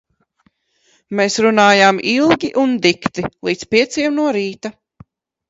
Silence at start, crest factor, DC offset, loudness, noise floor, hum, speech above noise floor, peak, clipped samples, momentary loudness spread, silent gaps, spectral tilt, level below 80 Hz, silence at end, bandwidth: 1.1 s; 16 dB; under 0.1%; -15 LUFS; -61 dBFS; none; 46 dB; 0 dBFS; under 0.1%; 13 LU; none; -4 dB/octave; -54 dBFS; 0.8 s; 8 kHz